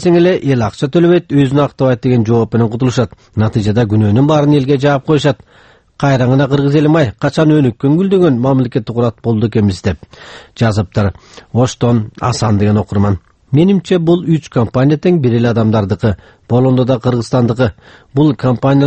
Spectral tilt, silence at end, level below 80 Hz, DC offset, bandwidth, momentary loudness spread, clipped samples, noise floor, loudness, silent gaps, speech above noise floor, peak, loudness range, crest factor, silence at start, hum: -7.5 dB/octave; 0 s; -40 dBFS; under 0.1%; 8.8 kHz; 6 LU; under 0.1%; -46 dBFS; -13 LUFS; none; 34 dB; 0 dBFS; 3 LU; 12 dB; 0 s; none